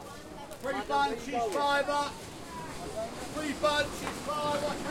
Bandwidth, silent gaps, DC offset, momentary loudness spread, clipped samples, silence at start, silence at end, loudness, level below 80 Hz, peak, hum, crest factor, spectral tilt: 16.5 kHz; none; under 0.1%; 14 LU; under 0.1%; 0 s; 0 s; -32 LUFS; -54 dBFS; -16 dBFS; none; 16 dB; -3.5 dB/octave